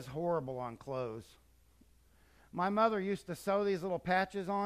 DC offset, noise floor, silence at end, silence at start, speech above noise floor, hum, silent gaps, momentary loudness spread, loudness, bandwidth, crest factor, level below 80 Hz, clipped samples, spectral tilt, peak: under 0.1%; -66 dBFS; 0 s; 0 s; 31 dB; none; none; 11 LU; -35 LUFS; 15 kHz; 20 dB; -66 dBFS; under 0.1%; -6.5 dB/octave; -16 dBFS